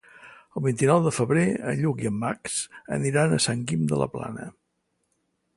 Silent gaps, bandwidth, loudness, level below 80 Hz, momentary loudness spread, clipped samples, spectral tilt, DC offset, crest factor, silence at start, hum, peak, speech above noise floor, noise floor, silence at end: none; 11.5 kHz; -25 LUFS; -58 dBFS; 13 LU; under 0.1%; -5.5 dB/octave; under 0.1%; 20 dB; 0.15 s; none; -6 dBFS; 51 dB; -75 dBFS; 1.05 s